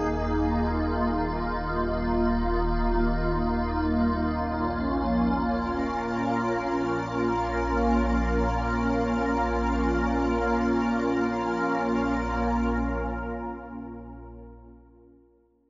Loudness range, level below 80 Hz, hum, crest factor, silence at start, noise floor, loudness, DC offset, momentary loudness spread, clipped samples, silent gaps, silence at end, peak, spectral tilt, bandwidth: 3 LU; -34 dBFS; none; 14 dB; 0 s; -62 dBFS; -27 LUFS; under 0.1%; 5 LU; under 0.1%; none; 0.9 s; -12 dBFS; -7.5 dB/octave; 7.4 kHz